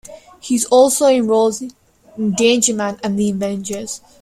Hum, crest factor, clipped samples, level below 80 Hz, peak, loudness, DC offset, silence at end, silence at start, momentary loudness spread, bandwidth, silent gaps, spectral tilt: none; 16 dB; under 0.1%; -54 dBFS; 0 dBFS; -16 LUFS; under 0.1%; 0.25 s; 0.1 s; 15 LU; 15 kHz; none; -3.5 dB/octave